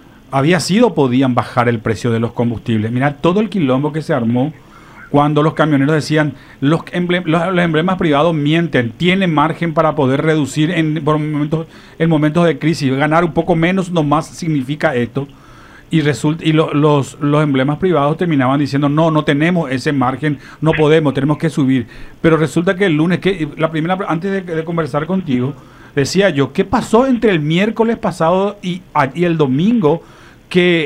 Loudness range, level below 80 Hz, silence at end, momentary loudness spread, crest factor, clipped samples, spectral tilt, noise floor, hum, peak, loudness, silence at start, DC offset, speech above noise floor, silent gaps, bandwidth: 2 LU; -44 dBFS; 0 s; 6 LU; 14 dB; under 0.1%; -6.5 dB/octave; -39 dBFS; none; 0 dBFS; -15 LUFS; 0.3 s; under 0.1%; 25 dB; none; 13 kHz